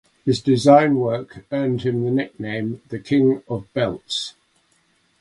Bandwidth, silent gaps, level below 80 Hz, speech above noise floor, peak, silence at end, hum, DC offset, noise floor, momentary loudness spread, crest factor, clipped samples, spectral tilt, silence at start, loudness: 11.5 kHz; none; -56 dBFS; 43 dB; 0 dBFS; 0.9 s; none; under 0.1%; -63 dBFS; 14 LU; 20 dB; under 0.1%; -6.5 dB/octave; 0.25 s; -20 LUFS